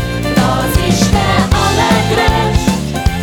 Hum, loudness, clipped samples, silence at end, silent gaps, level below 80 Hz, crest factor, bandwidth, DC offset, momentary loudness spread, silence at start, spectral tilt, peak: none; -12 LUFS; under 0.1%; 0 s; none; -20 dBFS; 12 dB; 19.5 kHz; under 0.1%; 4 LU; 0 s; -5 dB/octave; 0 dBFS